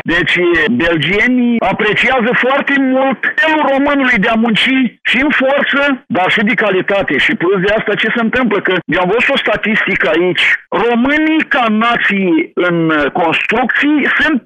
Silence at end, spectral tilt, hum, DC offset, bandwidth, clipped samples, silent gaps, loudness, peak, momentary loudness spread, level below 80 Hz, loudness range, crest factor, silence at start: 0.05 s; -6 dB/octave; none; under 0.1%; 10 kHz; under 0.1%; none; -11 LUFS; -4 dBFS; 3 LU; -42 dBFS; 1 LU; 8 dB; 0.05 s